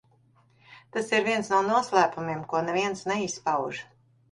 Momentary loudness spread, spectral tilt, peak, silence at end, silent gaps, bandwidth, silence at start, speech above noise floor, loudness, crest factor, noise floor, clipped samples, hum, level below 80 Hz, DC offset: 10 LU; -4 dB/octave; -8 dBFS; 0.5 s; none; 11.5 kHz; 0.7 s; 36 dB; -26 LUFS; 20 dB; -62 dBFS; under 0.1%; none; -68 dBFS; under 0.1%